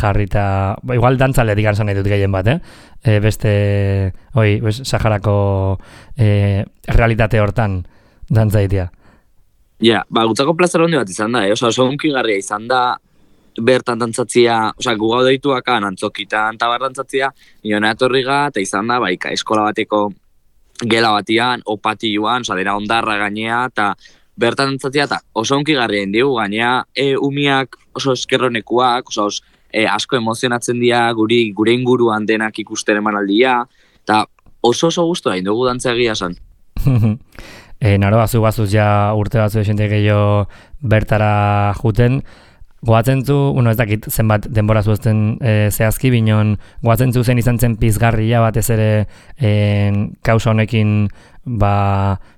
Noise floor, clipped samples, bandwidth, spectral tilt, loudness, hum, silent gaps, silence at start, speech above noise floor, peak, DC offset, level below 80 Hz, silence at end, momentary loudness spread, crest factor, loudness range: -52 dBFS; under 0.1%; 15.5 kHz; -6 dB/octave; -16 LUFS; none; none; 0 s; 37 dB; 0 dBFS; under 0.1%; -32 dBFS; 0.15 s; 6 LU; 14 dB; 2 LU